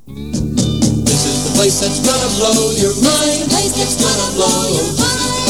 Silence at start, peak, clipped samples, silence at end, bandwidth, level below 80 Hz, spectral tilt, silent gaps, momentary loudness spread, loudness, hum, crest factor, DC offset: 0.05 s; 0 dBFS; under 0.1%; 0 s; over 20 kHz; -32 dBFS; -3.5 dB/octave; none; 3 LU; -13 LUFS; none; 14 dB; 1%